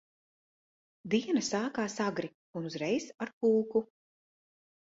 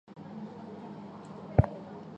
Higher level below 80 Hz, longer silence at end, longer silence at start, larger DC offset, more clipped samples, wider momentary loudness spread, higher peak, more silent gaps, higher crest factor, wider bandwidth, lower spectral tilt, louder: second, -76 dBFS vs -44 dBFS; first, 1 s vs 0 s; first, 1.05 s vs 0.05 s; neither; neither; second, 12 LU vs 17 LU; second, -16 dBFS vs -8 dBFS; first, 2.34-2.53 s, 3.33-3.41 s vs none; second, 18 dB vs 26 dB; about the same, 8 kHz vs 8 kHz; second, -4.5 dB/octave vs -10 dB/octave; about the same, -33 LUFS vs -33 LUFS